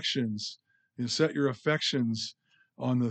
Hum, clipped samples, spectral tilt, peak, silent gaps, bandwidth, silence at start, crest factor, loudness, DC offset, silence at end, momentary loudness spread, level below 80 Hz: none; under 0.1%; -5 dB/octave; -14 dBFS; none; 9 kHz; 0 s; 18 dB; -30 LUFS; under 0.1%; 0 s; 10 LU; -80 dBFS